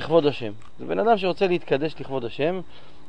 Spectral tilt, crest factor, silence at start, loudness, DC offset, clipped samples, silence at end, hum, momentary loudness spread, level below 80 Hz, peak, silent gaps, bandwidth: -7.5 dB/octave; 20 dB; 0 s; -24 LUFS; 2%; under 0.1%; 0.45 s; none; 13 LU; -58 dBFS; -6 dBFS; none; 9.4 kHz